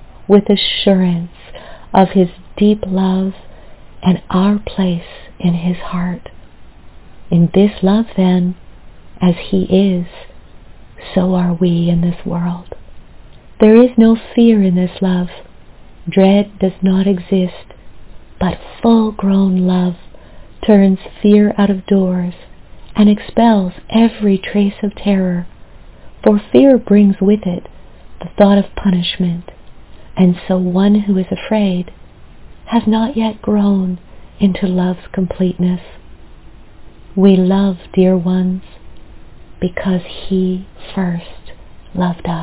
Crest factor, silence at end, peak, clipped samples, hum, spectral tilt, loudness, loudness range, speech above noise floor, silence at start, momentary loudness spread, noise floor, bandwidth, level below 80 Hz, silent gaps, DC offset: 14 dB; 0 s; 0 dBFS; 0.2%; none; -12 dB/octave; -14 LUFS; 5 LU; 24 dB; 0 s; 12 LU; -37 dBFS; 4 kHz; -40 dBFS; none; under 0.1%